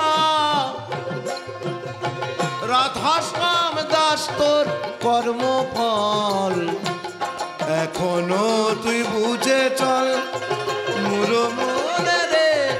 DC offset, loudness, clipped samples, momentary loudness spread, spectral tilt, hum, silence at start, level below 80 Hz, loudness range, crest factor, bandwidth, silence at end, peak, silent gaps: under 0.1%; -21 LUFS; under 0.1%; 9 LU; -3.5 dB/octave; none; 0 s; -60 dBFS; 2 LU; 16 dB; 16 kHz; 0 s; -6 dBFS; none